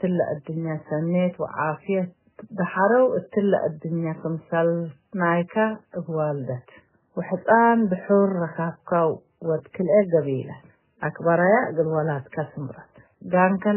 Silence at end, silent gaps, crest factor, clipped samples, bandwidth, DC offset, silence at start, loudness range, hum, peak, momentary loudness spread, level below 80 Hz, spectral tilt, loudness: 0 s; none; 18 dB; under 0.1%; 3.2 kHz; under 0.1%; 0 s; 3 LU; none; -4 dBFS; 13 LU; -66 dBFS; -11.5 dB/octave; -23 LUFS